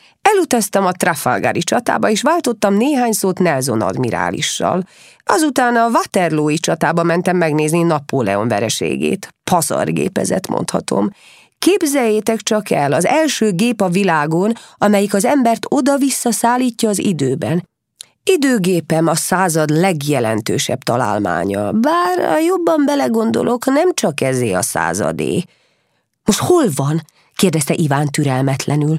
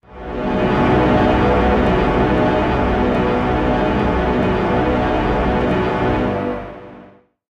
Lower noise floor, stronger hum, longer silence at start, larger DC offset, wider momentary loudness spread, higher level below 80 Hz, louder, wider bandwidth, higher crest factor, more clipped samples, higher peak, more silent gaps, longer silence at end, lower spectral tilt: first, -65 dBFS vs -45 dBFS; second, none vs 50 Hz at -35 dBFS; first, 0.25 s vs 0.1 s; neither; about the same, 5 LU vs 7 LU; second, -56 dBFS vs -26 dBFS; about the same, -16 LUFS vs -17 LUFS; first, 16 kHz vs 8.4 kHz; about the same, 16 dB vs 14 dB; neither; first, 0 dBFS vs -4 dBFS; neither; second, 0 s vs 0.45 s; second, -5 dB/octave vs -8 dB/octave